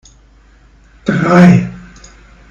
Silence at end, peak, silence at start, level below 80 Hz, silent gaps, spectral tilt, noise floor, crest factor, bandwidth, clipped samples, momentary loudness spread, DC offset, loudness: 0.7 s; 0 dBFS; 1.05 s; -40 dBFS; none; -8 dB/octave; -45 dBFS; 14 dB; 7.4 kHz; 1%; 16 LU; under 0.1%; -10 LUFS